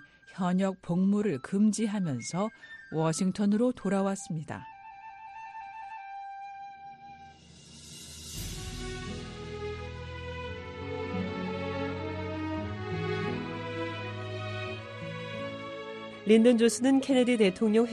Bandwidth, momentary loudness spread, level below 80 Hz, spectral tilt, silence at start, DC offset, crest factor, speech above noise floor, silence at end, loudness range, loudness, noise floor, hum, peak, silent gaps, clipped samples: 12.5 kHz; 20 LU; -54 dBFS; -5.5 dB/octave; 0 s; under 0.1%; 20 dB; 26 dB; 0 s; 14 LU; -30 LUFS; -52 dBFS; none; -10 dBFS; none; under 0.1%